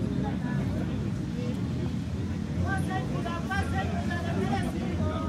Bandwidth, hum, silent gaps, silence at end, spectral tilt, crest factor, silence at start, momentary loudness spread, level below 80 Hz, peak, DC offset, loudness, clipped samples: 13.5 kHz; none; none; 0 s; -7 dB/octave; 14 dB; 0 s; 3 LU; -44 dBFS; -14 dBFS; under 0.1%; -30 LUFS; under 0.1%